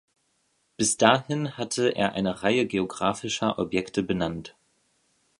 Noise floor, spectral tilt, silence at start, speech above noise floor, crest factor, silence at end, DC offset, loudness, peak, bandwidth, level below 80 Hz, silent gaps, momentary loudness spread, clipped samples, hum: -71 dBFS; -4 dB/octave; 0.8 s; 46 dB; 26 dB; 0.9 s; under 0.1%; -25 LUFS; -2 dBFS; 11.5 kHz; -56 dBFS; none; 9 LU; under 0.1%; none